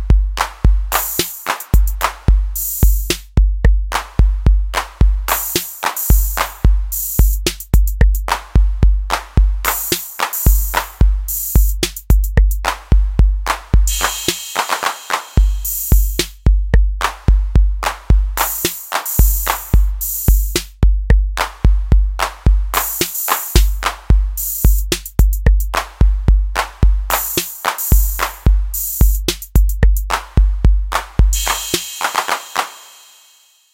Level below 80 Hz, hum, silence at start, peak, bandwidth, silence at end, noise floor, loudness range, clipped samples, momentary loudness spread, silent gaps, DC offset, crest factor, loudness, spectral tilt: -16 dBFS; none; 0 s; 0 dBFS; 17 kHz; 0.95 s; -51 dBFS; 1 LU; under 0.1%; 5 LU; none; 0.2%; 14 dB; -17 LUFS; -4 dB/octave